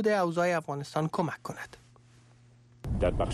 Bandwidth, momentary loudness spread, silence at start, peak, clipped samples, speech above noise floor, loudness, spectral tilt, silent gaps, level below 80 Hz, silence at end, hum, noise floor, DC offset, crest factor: 13.5 kHz; 16 LU; 0 s; -16 dBFS; under 0.1%; 29 dB; -31 LUFS; -6.5 dB/octave; none; -44 dBFS; 0 s; none; -58 dBFS; under 0.1%; 16 dB